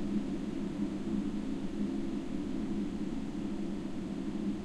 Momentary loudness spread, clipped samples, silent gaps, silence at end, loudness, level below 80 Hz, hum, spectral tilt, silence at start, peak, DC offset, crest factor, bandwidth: 3 LU; under 0.1%; none; 0 s; -37 LUFS; -48 dBFS; none; -7.5 dB/octave; 0 s; -22 dBFS; under 0.1%; 14 dB; 11 kHz